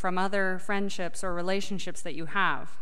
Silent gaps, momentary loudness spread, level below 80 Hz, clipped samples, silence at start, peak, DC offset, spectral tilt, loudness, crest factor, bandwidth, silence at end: none; 8 LU; -52 dBFS; under 0.1%; 0 s; -14 dBFS; 5%; -4.5 dB/octave; -31 LUFS; 18 dB; 14 kHz; 0.05 s